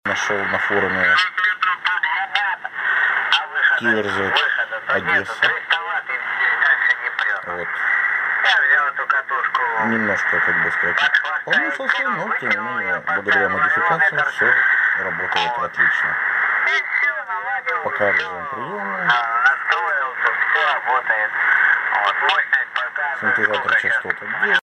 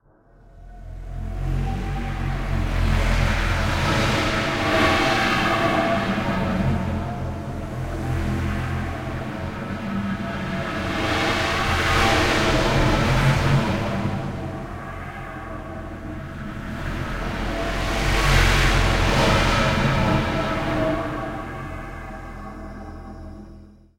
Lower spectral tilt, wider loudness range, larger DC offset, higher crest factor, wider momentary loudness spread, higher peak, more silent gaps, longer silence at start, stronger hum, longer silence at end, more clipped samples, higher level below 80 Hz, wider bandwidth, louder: second, -3 dB/octave vs -5 dB/octave; second, 2 LU vs 9 LU; neither; about the same, 18 dB vs 18 dB; second, 6 LU vs 16 LU; first, 0 dBFS vs -4 dBFS; neither; second, 0.05 s vs 0.55 s; neither; second, 0 s vs 0.25 s; neither; second, -66 dBFS vs -30 dBFS; second, 10.5 kHz vs 16 kHz; first, -18 LUFS vs -22 LUFS